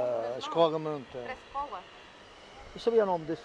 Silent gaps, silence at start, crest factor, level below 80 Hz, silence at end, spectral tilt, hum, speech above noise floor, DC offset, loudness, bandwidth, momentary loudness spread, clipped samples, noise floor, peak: none; 0 s; 20 dB; -62 dBFS; 0 s; -6 dB/octave; none; 22 dB; under 0.1%; -31 LUFS; 9.4 kHz; 23 LU; under 0.1%; -52 dBFS; -12 dBFS